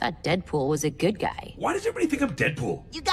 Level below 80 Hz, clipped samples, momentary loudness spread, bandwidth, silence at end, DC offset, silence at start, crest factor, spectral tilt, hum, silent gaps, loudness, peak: -48 dBFS; under 0.1%; 6 LU; 14 kHz; 0 s; under 0.1%; 0 s; 18 dB; -5 dB/octave; none; none; -27 LUFS; -8 dBFS